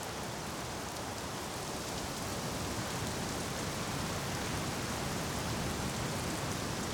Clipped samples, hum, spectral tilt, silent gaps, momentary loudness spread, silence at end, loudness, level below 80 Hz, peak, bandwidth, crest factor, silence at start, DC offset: under 0.1%; none; -3.5 dB/octave; none; 4 LU; 0 s; -37 LUFS; -52 dBFS; -24 dBFS; over 20 kHz; 14 dB; 0 s; under 0.1%